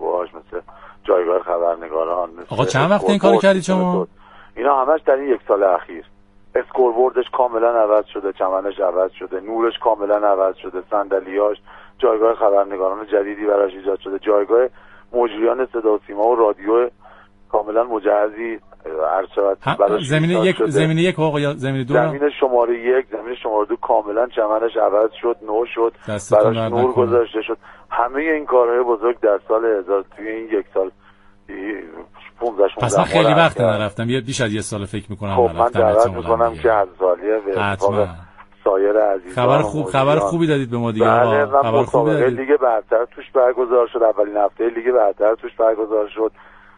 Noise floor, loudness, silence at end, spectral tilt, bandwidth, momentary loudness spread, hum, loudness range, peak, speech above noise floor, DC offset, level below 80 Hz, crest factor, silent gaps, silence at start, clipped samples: -46 dBFS; -18 LUFS; 0.5 s; -6 dB/octave; 11 kHz; 9 LU; none; 3 LU; 0 dBFS; 28 dB; under 0.1%; -50 dBFS; 18 dB; none; 0 s; under 0.1%